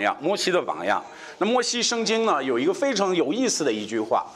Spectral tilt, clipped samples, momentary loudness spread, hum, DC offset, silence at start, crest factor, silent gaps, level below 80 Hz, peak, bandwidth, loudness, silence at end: -3 dB/octave; under 0.1%; 5 LU; none; under 0.1%; 0 s; 16 dB; none; -72 dBFS; -8 dBFS; 13.5 kHz; -23 LUFS; 0 s